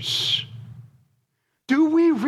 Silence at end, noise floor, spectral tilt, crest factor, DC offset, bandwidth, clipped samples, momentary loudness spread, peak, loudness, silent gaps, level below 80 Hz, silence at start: 0 s; -73 dBFS; -4 dB/octave; 14 dB; under 0.1%; 13 kHz; under 0.1%; 20 LU; -8 dBFS; -20 LUFS; none; -68 dBFS; 0 s